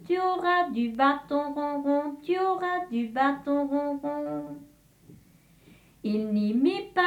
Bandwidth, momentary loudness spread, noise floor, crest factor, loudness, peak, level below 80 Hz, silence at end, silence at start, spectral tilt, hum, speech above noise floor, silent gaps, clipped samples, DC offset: 13 kHz; 8 LU; -58 dBFS; 16 dB; -27 LUFS; -10 dBFS; -66 dBFS; 0 s; 0 s; -6.5 dB/octave; none; 31 dB; none; under 0.1%; under 0.1%